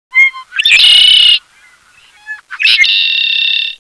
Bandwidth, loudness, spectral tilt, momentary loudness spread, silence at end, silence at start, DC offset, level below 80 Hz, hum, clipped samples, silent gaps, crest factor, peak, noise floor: 11 kHz; -6 LUFS; 4 dB/octave; 12 LU; 0.05 s; 0.15 s; under 0.1%; -48 dBFS; none; under 0.1%; none; 10 dB; 0 dBFS; -45 dBFS